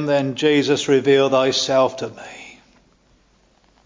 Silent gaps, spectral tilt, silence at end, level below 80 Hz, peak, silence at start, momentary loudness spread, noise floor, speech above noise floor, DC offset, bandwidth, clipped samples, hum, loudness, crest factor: none; -4.5 dB/octave; 1.35 s; -60 dBFS; -4 dBFS; 0 s; 19 LU; -58 dBFS; 40 dB; under 0.1%; 7.6 kHz; under 0.1%; none; -17 LUFS; 16 dB